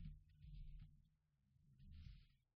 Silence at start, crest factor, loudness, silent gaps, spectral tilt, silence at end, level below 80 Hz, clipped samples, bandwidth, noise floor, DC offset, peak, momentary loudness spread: 0 s; 16 dB; -64 LUFS; none; -7 dB/octave; 0.2 s; -62 dBFS; under 0.1%; 5.2 kHz; -82 dBFS; under 0.1%; -44 dBFS; 5 LU